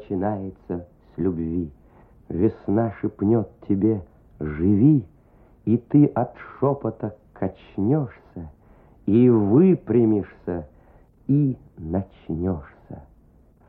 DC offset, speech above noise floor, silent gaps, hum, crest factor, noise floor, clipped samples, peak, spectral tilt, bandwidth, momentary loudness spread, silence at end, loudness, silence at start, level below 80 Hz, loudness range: under 0.1%; 33 dB; none; none; 18 dB; -54 dBFS; under 0.1%; -6 dBFS; -13 dB/octave; 3.8 kHz; 17 LU; 0.65 s; -23 LUFS; 0 s; -48 dBFS; 5 LU